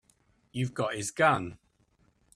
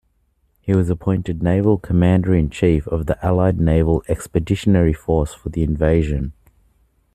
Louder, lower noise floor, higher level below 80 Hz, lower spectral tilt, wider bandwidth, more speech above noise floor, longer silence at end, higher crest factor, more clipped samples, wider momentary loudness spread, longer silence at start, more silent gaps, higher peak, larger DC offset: second, -29 LUFS vs -18 LUFS; first, -68 dBFS vs -63 dBFS; second, -64 dBFS vs -32 dBFS; second, -4.5 dB/octave vs -8.5 dB/octave; about the same, 13.5 kHz vs 13 kHz; second, 40 dB vs 46 dB; about the same, 0.8 s vs 0.8 s; first, 22 dB vs 16 dB; neither; first, 15 LU vs 7 LU; about the same, 0.55 s vs 0.65 s; neither; second, -10 dBFS vs -2 dBFS; neither